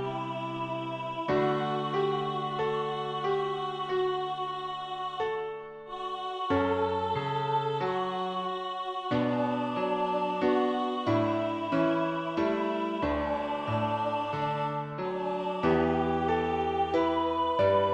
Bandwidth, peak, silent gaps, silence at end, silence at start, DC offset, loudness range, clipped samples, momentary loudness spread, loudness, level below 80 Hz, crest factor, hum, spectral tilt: 9 kHz; -12 dBFS; none; 0 s; 0 s; under 0.1%; 3 LU; under 0.1%; 7 LU; -30 LUFS; -56 dBFS; 16 dB; none; -7 dB/octave